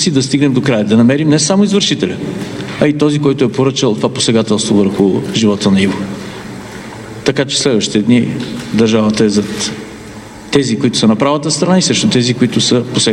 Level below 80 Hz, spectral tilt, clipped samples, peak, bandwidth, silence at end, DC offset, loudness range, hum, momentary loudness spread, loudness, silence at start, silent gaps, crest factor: -46 dBFS; -4.5 dB/octave; under 0.1%; 0 dBFS; 12 kHz; 0 s; under 0.1%; 2 LU; none; 13 LU; -12 LUFS; 0 s; none; 12 dB